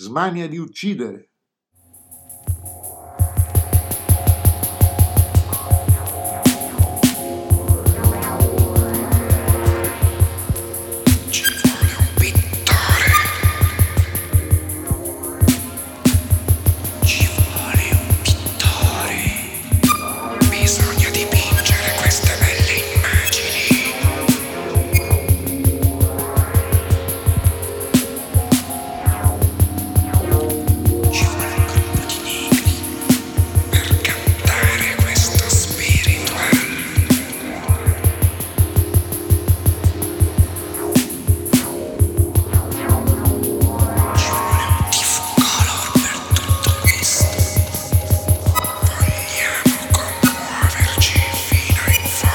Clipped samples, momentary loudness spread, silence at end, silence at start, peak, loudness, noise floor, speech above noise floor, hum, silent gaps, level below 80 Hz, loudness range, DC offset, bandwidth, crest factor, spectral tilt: under 0.1%; 6 LU; 0 s; 0 s; 0 dBFS; -17 LUFS; -67 dBFS; 43 dB; none; none; -26 dBFS; 3 LU; under 0.1%; 19.5 kHz; 16 dB; -4.5 dB/octave